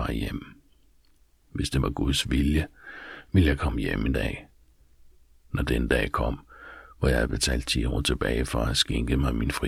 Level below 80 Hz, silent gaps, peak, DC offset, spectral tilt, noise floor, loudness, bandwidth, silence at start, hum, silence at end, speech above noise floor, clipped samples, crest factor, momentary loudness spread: -32 dBFS; none; -8 dBFS; under 0.1%; -5 dB/octave; -60 dBFS; -26 LUFS; 15 kHz; 0 s; none; 0 s; 35 dB; under 0.1%; 18 dB; 15 LU